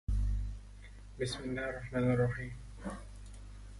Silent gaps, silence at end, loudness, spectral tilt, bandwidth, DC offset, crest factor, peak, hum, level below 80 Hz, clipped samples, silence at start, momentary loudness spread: none; 0 s; -37 LUFS; -6.5 dB/octave; 11.5 kHz; under 0.1%; 18 dB; -20 dBFS; 50 Hz at -50 dBFS; -42 dBFS; under 0.1%; 0.1 s; 20 LU